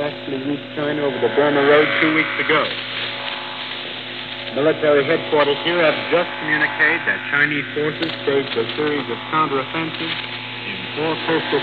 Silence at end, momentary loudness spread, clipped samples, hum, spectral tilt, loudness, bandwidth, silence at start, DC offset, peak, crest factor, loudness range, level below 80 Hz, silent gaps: 0 s; 11 LU; under 0.1%; none; -7 dB/octave; -19 LUFS; 5 kHz; 0 s; 0.2%; -2 dBFS; 18 dB; 4 LU; -62 dBFS; none